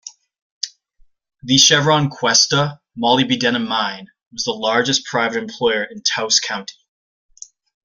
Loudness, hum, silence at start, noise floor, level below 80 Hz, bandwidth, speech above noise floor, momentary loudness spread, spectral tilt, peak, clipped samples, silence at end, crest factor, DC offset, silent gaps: -16 LUFS; none; 0.05 s; -54 dBFS; -58 dBFS; 15 kHz; 37 dB; 17 LU; -2.5 dB/octave; 0 dBFS; under 0.1%; 1.15 s; 20 dB; under 0.1%; 0.42-0.61 s, 4.27-4.31 s